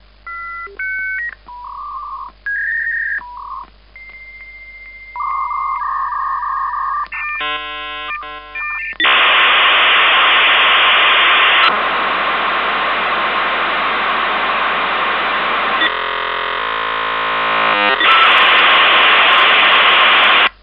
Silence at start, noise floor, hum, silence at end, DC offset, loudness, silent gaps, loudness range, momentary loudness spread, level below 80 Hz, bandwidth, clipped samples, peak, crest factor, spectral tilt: 0.25 s; -39 dBFS; 50 Hz at -45 dBFS; 0.1 s; 0.1%; -12 LUFS; none; 13 LU; 19 LU; -46 dBFS; 5.6 kHz; under 0.1%; 0 dBFS; 14 dB; -3.5 dB/octave